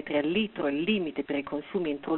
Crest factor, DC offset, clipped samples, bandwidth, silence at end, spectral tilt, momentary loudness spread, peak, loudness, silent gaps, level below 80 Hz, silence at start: 16 dB; under 0.1%; under 0.1%; 4.2 kHz; 0 s; -4 dB/octave; 5 LU; -12 dBFS; -30 LUFS; none; -62 dBFS; 0 s